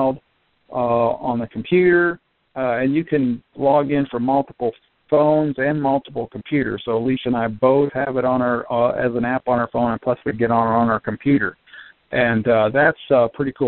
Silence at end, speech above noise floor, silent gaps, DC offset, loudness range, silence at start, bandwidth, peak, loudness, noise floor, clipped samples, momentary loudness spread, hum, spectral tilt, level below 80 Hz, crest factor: 0 s; 26 dB; none; 0.1%; 2 LU; 0 s; 4.3 kHz; -2 dBFS; -19 LUFS; -44 dBFS; under 0.1%; 8 LU; none; -5.5 dB/octave; -52 dBFS; 16 dB